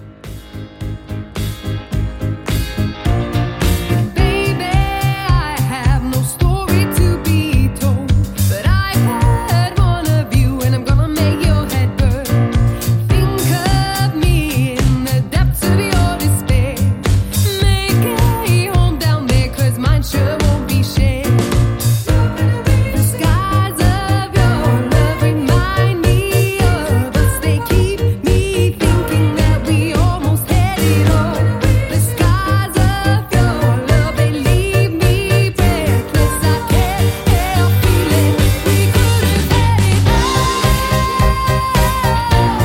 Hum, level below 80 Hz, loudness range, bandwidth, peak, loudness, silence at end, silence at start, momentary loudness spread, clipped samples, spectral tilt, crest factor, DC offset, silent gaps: none; -20 dBFS; 2 LU; 17 kHz; 0 dBFS; -15 LUFS; 0 s; 0 s; 4 LU; under 0.1%; -5.5 dB/octave; 12 dB; under 0.1%; none